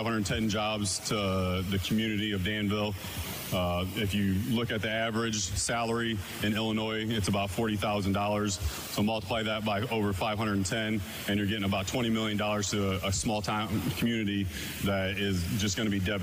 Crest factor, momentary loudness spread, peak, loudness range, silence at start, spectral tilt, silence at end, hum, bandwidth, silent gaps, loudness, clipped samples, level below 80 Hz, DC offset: 10 dB; 3 LU; -20 dBFS; 1 LU; 0 s; -4.5 dB/octave; 0 s; none; 16 kHz; none; -30 LUFS; under 0.1%; -48 dBFS; under 0.1%